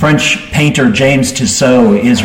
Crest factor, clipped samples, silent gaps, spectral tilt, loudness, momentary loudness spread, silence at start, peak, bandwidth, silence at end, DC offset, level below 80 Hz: 10 dB; under 0.1%; none; -4.5 dB/octave; -9 LUFS; 3 LU; 0 s; 0 dBFS; 16.5 kHz; 0 s; under 0.1%; -36 dBFS